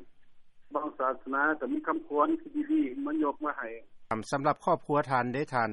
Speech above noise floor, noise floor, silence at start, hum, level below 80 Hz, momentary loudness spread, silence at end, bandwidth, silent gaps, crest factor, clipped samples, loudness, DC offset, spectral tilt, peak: 21 dB; -51 dBFS; 0 s; none; -64 dBFS; 8 LU; 0 s; 11 kHz; none; 18 dB; under 0.1%; -31 LUFS; under 0.1%; -6.5 dB/octave; -12 dBFS